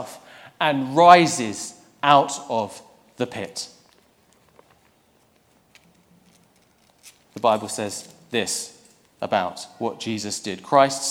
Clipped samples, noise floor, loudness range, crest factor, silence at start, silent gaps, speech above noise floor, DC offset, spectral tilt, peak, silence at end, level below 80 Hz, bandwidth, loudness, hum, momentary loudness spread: under 0.1%; -60 dBFS; 17 LU; 24 dB; 0 s; none; 40 dB; under 0.1%; -3.5 dB/octave; 0 dBFS; 0 s; -70 dBFS; 16.5 kHz; -21 LUFS; none; 20 LU